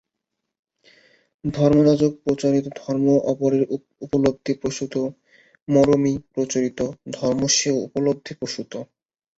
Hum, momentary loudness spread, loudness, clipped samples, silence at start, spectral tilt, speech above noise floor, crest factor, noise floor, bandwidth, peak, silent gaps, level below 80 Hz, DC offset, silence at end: none; 13 LU; -21 LUFS; under 0.1%; 1.45 s; -5 dB/octave; 60 dB; 18 dB; -81 dBFS; 8 kHz; -4 dBFS; 5.62-5.66 s; -54 dBFS; under 0.1%; 0.55 s